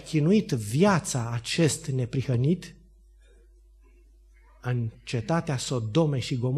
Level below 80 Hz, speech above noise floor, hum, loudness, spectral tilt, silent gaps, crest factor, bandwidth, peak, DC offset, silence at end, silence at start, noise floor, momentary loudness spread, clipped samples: -54 dBFS; 29 dB; none; -26 LUFS; -6 dB/octave; none; 18 dB; 13 kHz; -10 dBFS; under 0.1%; 0 s; 0 s; -55 dBFS; 9 LU; under 0.1%